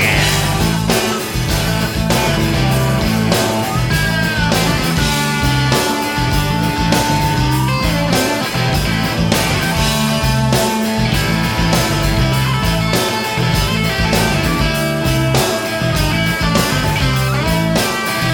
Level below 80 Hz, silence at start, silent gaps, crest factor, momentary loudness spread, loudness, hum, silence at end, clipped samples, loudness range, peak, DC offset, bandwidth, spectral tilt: -26 dBFS; 0 s; none; 14 dB; 2 LU; -15 LUFS; none; 0 s; under 0.1%; 0 LU; 0 dBFS; under 0.1%; 18 kHz; -4.5 dB/octave